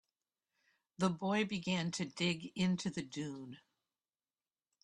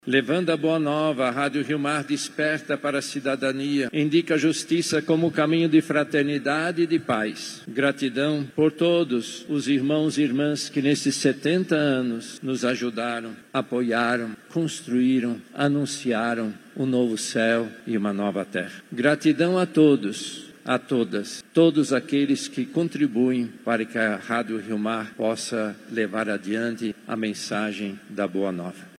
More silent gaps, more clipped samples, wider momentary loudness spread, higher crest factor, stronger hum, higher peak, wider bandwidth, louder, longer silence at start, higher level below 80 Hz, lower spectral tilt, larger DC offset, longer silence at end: neither; neither; about the same, 9 LU vs 8 LU; about the same, 20 dB vs 18 dB; neither; second, -20 dBFS vs -6 dBFS; second, 11 kHz vs 13.5 kHz; second, -37 LUFS vs -24 LUFS; first, 1 s vs 0.05 s; about the same, -74 dBFS vs -76 dBFS; about the same, -5 dB/octave vs -5 dB/octave; neither; first, 1.25 s vs 0.1 s